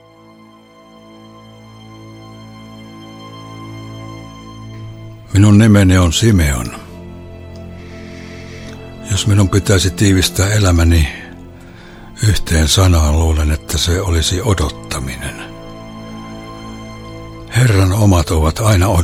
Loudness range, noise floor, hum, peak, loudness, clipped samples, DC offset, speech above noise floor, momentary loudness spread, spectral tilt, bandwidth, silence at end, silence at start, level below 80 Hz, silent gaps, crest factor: 19 LU; -42 dBFS; none; 0 dBFS; -13 LUFS; under 0.1%; under 0.1%; 31 dB; 23 LU; -5 dB/octave; 16 kHz; 0 s; 1.9 s; -28 dBFS; none; 14 dB